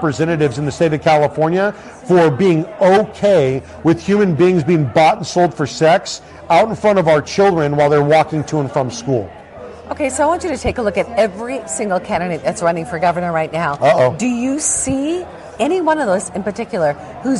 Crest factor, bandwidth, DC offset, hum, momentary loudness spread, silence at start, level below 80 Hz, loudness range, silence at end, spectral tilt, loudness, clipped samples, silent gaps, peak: 12 dB; 12 kHz; under 0.1%; none; 9 LU; 0 s; -44 dBFS; 5 LU; 0 s; -5.5 dB/octave; -15 LUFS; under 0.1%; none; -2 dBFS